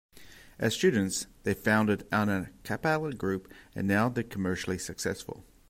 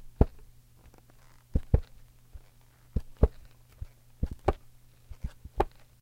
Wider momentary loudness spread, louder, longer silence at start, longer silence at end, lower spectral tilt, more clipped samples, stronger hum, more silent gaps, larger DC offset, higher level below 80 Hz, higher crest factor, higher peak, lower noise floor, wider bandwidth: second, 9 LU vs 25 LU; first, -30 LUFS vs -33 LUFS; about the same, 0.15 s vs 0.05 s; about the same, 0.25 s vs 0.35 s; second, -5 dB/octave vs -9 dB/octave; neither; neither; neither; neither; second, -58 dBFS vs -36 dBFS; second, 18 dB vs 28 dB; second, -12 dBFS vs -4 dBFS; second, -52 dBFS vs -57 dBFS; about the same, 16 kHz vs 15 kHz